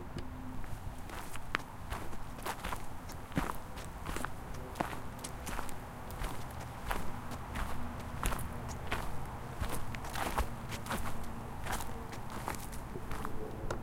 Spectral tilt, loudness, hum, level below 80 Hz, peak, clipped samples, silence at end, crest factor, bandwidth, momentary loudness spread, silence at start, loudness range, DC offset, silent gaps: -4.5 dB/octave; -42 LUFS; none; -44 dBFS; -10 dBFS; under 0.1%; 0 s; 28 dB; 17 kHz; 7 LU; 0 s; 2 LU; under 0.1%; none